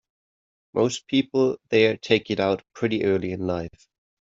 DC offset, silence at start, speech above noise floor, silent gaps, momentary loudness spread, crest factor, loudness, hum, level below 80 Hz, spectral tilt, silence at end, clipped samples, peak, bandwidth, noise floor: under 0.1%; 0.75 s; over 67 dB; none; 8 LU; 20 dB; -24 LUFS; none; -60 dBFS; -5.5 dB/octave; 0.7 s; under 0.1%; -4 dBFS; 8 kHz; under -90 dBFS